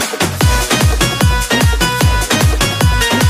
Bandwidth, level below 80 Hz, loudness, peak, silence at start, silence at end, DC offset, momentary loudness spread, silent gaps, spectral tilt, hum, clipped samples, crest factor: 15.5 kHz; -18 dBFS; -12 LUFS; 0 dBFS; 0 s; 0 s; under 0.1%; 2 LU; none; -4 dB/octave; none; under 0.1%; 12 dB